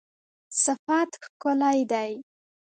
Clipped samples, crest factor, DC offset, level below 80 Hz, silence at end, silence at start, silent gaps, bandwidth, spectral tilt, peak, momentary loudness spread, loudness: under 0.1%; 18 dB; under 0.1%; -78 dBFS; 0.5 s; 0.5 s; 0.79-0.87 s, 1.29-1.40 s; 9.4 kHz; -2 dB/octave; -10 dBFS; 9 LU; -26 LUFS